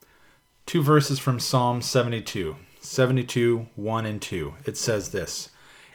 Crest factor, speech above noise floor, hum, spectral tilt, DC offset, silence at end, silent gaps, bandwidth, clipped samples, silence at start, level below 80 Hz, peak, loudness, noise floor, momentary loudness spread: 20 dB; 34 dB; none; -5 dB/octave; under 0.1%; 0.45 s; none; 19 kHz; under 0.1%; 0.65 s; -54 dBFS; -6 dBFS; -25 LUFS; -59 dBFS; 12 LU